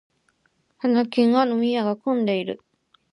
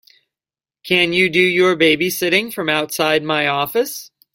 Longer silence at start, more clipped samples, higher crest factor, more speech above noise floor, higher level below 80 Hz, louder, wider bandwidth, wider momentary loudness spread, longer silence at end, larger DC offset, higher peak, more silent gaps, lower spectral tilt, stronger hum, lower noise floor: about the same, 0.85 s vs 0.85 s; neither; about the same, 16 dB vs 18 dB; second, 47 dB vs over 73 dB; second, -74 dBFS vs -58 dBFS; second, -22 LUFS vs -16 LUFS; second, 10.5 kHz vs 16.5 kHz; first, 9 LU vs 6 LU; first, 0.55 s vs 0.25 s; neither; second, -8 dBFS vs 0 dBFS; neither; first, -7 dB/octave vs -3.5 dB/octave; neither; second, -67 dBFS vs under -90 dBFS